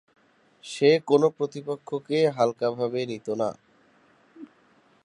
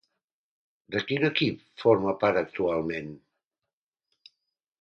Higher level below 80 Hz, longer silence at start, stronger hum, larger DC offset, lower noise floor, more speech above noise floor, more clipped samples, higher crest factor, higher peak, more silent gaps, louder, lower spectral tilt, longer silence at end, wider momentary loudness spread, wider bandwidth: second, -76 dBFS vs -62 dBFS; second, 0.65 s vs 0.9 s; neither; neither; second, -61 dBFS vs -89 dBFS; second, 37 dB vs 63 dB; neither; about the same, 20 dB vs 20 dB; first, -6 dBFS vs -10 dBFS; neither; about the same, -25 LUFS vs -27 LUFS; about the same, -6 dB/octave vs -7 dB/octave; second, 0.6 s vs 1.65 s; about the same, 12 LU vs 10 LU; first, 11 kHz vs 6.6 kHz